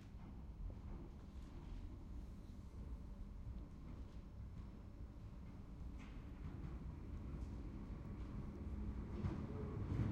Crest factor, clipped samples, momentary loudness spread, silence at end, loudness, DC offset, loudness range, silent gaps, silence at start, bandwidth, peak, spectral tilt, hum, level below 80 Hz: 20 dB; under 0.1%; 9 LU; 0 s; -52 LUFS; under 0.1%; 6 LU; none; 0 s; 8.8 kHz; -30 dBFS; -8.5 dB/octave; none; -52 dBFS